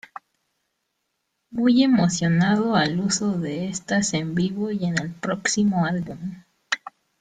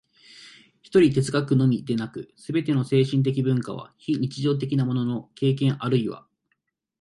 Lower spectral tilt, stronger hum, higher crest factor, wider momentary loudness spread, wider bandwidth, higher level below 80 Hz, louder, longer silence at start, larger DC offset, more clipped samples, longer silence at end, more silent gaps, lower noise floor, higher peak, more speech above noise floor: second, -5 dB/octave vs -7.5 dB/octave; neither; about the same, 18 dB vs 18 dB; about the same, 10 LU vs 11 LU; second, 9.4 kHz vs 11.5 kHz; about the same, -58 dBFS vs -62 dBFS; about the same, -22 LUFS vs -24 LUFS; first, 1.5 s vs 0.4 s; neither; neither; second, 0.3 s vs 0.8 s; neither; about the same, -76 dBFS vs -75 dBFS; about the same, -6 dBFS vs -6 dBFS; about the same, 55 dB vs 52 dB